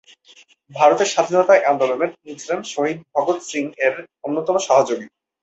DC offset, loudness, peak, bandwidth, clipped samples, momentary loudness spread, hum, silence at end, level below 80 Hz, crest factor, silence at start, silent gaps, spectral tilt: under 0.1%; -19 LUFS; -2 dBFS; 8.2 kHz; under 0.1%; 12 LU; none; 0.35 s; -70 dBFS; 18 dB; 0.7 s; none; -3.5 dB/octave